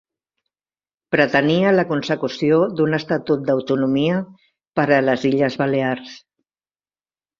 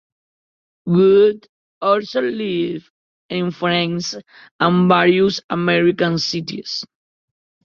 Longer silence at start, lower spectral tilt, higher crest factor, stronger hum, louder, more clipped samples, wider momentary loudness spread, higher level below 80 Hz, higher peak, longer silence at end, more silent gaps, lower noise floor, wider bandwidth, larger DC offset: first, 1.1 s vs 0.85 s; about the same, -7 dB/octave vs -6 dB/octave; about the same, 18 dB vs 18 dB; first, 50 Hz at -50 dBFS vs none; about the same, -19 LUFS vs -17 LUFS; neither; second, 8 LU vs 14 LU; about the same, -60 dBFS vs -60 dBFS; about the same, -2 dBFS vs 0 dBFS; first, 1.2 s vs 0.8 s; second, 4.67-4.72 s vs 1.49-1.81 s, 2.90-3.29 s, 4.51-4.59 s, 5.44-5.49 s; about the same, under -90 dBFS vs under -90 dBFS; about the same, 7.4 kHz vs 7.4 kHz; neither